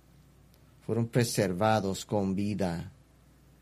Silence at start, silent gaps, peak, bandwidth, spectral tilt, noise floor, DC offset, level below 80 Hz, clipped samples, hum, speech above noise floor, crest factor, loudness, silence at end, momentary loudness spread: 0.9 s; none; -10 dBFS; 15 kHz; -5.5 dB/octave; -59 dBFS; under 0.1%; -60 dBFS; under 0.1%; none; 31 dB; 20 dB; -30 LUFS; 0.7 s; 11 LU